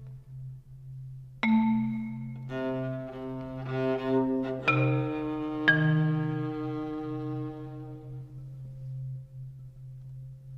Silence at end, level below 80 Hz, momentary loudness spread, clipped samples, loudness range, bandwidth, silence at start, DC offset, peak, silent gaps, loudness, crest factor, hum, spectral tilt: 0 s; -56 dBFS; 20 LU; under 0.1%; 11 LU; 6.4 kHz; 0 s; under 0.1%; -10 dBFS; none; -30 LUFS; 22 dB; none; -8.5 dB/octave